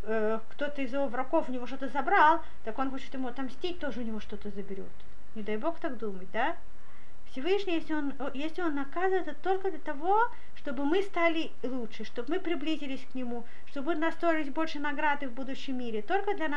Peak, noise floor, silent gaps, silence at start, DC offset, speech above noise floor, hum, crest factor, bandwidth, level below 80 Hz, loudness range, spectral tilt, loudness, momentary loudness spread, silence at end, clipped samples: -12 dBFS; -57 dBFS; none; 0.05 s; 4%; 25 dB; none; 20 dB; 11 kHz; -60 dBFS; 7 LU; -6 dB/octave; -32 LUFS; 12 LU; 0 s; under 0.1%